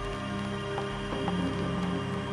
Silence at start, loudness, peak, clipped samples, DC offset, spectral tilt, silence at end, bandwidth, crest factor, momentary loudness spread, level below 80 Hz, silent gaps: 0 s; -32 LUFS; -18 dBFS; under 0.1%; under 0.1%; -6.5 dB/octave; 0 s; 11 kHz; 14 dB; 3 LU; -46 dBFS; none